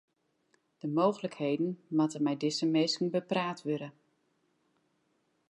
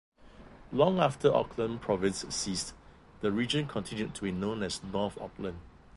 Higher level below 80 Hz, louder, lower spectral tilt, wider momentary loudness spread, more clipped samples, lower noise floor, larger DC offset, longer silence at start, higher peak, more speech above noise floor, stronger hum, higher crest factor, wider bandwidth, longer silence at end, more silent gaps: second, -86 dBFS vs -56 dBFS; about the same, -31 LUFS vs -32 LUFS; about the same, -5.5 dB/octave vs -5 dB/octave; second, 8 LU vs 13 LU; neither; first, -75 dBFS vs -52 dBFS; neither; first, 0.85 s vs 0.25 s; second, -14 dBFS vs -10 dBFS; first, 45 dB vs 22 dB; neither; about the same, 18 dB vs 22 dB; about the same, 11 kHz vs 11.5 kHz; first, 1.6 s vs 0 s; neither